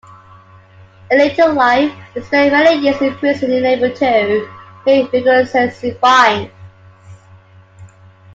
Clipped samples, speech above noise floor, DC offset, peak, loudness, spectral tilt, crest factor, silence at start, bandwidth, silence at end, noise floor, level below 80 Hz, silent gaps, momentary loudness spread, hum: under 0.1%; 30 dB; under 0.1%; 0 dBFS; -13 LUFS; -5 dB/octave; 14 dB; 1.1 s; 7.8 kHz; 0.5 s; -43 dBFS; -56 dBFS; none; 9 LU; none